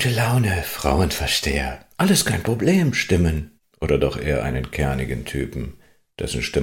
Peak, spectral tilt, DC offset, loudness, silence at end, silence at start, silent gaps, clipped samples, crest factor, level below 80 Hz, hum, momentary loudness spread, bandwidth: -4 dBFS; -5 dB/octave; under 0.1%; -21 LUFS; 0 s; 0 s; none; under 0.1%; 18 dB; -32 dBFS; none; 11 LU; 17 kHz